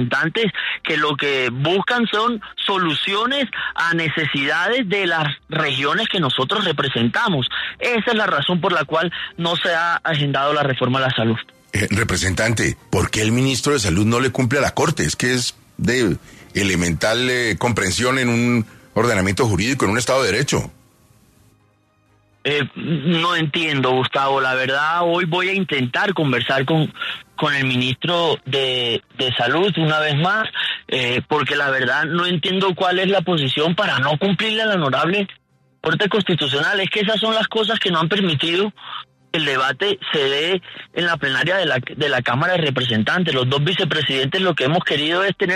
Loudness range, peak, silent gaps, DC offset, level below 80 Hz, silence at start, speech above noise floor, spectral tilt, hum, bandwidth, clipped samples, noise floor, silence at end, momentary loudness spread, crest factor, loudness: 2 LU; -4 dBFS; none; under 0.1%; -48 dBFS; 0 s; 40 dB; -4.5 dB/octave; none; 13.5 kHz; under 0.1%; -59 dBFS; 0 s; 4 LU; 14 dB; -18 LUFS